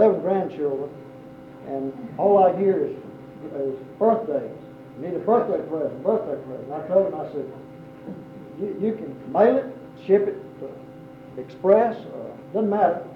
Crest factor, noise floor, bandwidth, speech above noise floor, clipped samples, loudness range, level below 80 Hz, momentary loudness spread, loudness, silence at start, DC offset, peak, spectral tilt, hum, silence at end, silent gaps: 18 dB; -42 dBFS; 5.6 kHz; 19 dB; under 0.1%; 4 LU; -66 dBFS; 22 LU; -23 LUFS; 0 s; under 0.1%; -4 dBFS; -9.5 dB/octave; none; 0 s; none